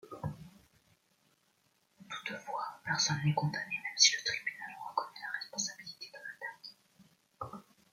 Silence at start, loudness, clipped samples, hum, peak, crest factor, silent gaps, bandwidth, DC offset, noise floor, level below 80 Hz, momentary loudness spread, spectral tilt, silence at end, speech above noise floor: 0.05 s; -33 LUFS; under 0.1%; none; -12 dBFS; 26 dB; none; 15.5 kHz; under 0.1%; -74 dBFS; -72 dBFS; 21 LU; -2 dB/octave; 0.3 s; 42 dB